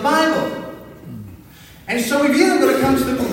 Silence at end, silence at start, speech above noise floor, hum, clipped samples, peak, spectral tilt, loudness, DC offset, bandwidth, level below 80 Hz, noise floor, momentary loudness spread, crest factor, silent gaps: 0 s; 0 s; 27 dB; none; under 0.1%; 0 dBFS; -4.5 dB/octave; -17 LUFS; under 0.1%; 16.5 kHz; -46 dBFS; -42 dBFS; 22 LU; 18 dB; none